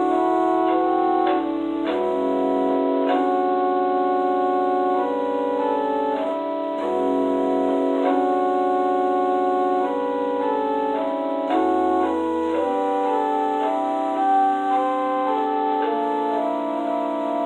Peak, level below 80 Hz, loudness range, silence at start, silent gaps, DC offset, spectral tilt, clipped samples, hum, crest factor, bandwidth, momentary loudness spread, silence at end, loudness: -8 dBFS; -60 dBFS; 1 LU; 0 s; none; under 0.1%; -6 dB/octave; under 0.1%; none; 12 dB; 9.2 kHz; 4 LU; 0 s; -21 LUFS